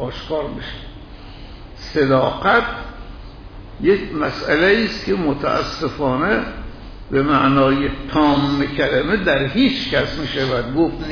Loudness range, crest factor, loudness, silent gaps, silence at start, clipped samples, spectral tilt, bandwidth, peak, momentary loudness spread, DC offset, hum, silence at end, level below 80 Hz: 4 LU; 14 dB; -18 LUFS; none; 0 s; under 0.1%; -6.5 dB/octave; 5.4 kHz; -4 dBFS; 22 LU; under 0.1%; none; 0 s; -36 dBFS